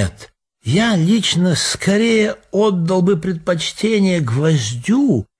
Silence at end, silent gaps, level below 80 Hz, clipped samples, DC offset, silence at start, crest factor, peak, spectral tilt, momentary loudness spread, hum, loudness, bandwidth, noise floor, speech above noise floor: 0.15 s; none; -46 dBFS; under 0.1%; under 0.1%; 0 s; 12 dB; -4 dBFS; -5 dB/octave; 5 LU; none; -16 LUFS; 11 kHz; -44 dBFS; 28 dB